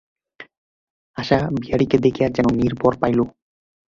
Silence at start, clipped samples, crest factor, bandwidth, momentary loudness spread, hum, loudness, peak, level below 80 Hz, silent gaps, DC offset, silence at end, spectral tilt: 0.4 s; under 0.1%; 18 dB; 7.4 kHz; 8 LU; none; -20 LUFS; -2 dBFS; -44 dBFS; 0.58-1.14 s; under 0.1%; 0.6 s; -7.5 dB/octave